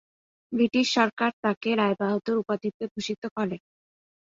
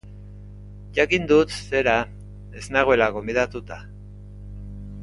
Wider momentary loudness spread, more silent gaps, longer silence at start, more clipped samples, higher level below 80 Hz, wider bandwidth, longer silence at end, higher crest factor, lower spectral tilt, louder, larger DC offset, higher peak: second, 10 LU vs 24 LU; first, 1.13-1.17 s, 1.33-1.43 s, 1.57-1.61 s, 2.74-2.80 s, 2.91-2.95 s, 3.18-3.22 s, 3.31-3.36 s vs none; first, 0.5 s vs 0.05 s; neither; second, -70 dBFS vs -42 dBFS; second, 7.8 kHz vs 11.5 kHz; first, 0.65 s vs 0 s; about the same, 20 dB vs 22 dB; about the same, -5 dB/octave vs -5 dB/octave; second, -26 LUFS vs -21 LUFS; neither; second, -6 dBFS vs -2 dBFS